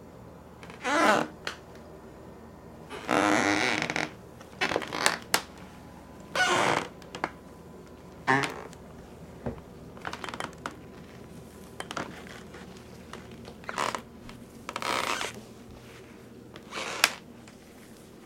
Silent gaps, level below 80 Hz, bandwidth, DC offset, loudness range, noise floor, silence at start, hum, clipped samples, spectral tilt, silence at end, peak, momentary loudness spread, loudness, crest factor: none; -60 dBFS; 17 kHz; under 0.1%; 12 LU; -50 dBFS; 0 s; none; under 0.1%; -3 dB/octave; 0 s; 0 dBFS; 23 LU; -29 LUFS; 32 dB